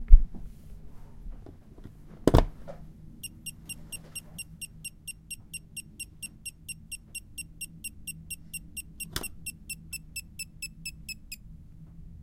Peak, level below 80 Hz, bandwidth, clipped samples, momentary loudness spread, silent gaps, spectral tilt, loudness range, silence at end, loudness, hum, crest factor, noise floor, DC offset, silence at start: 0 dBFS; -30 dBFS; 16.5 kHz; under 0.1%; 21 LU; none; -4.5 dB/octave; 8 LU; 0.1 s; -35 LUFS; none; 28 dB; -48 dBFS; under 0.1%; 0 s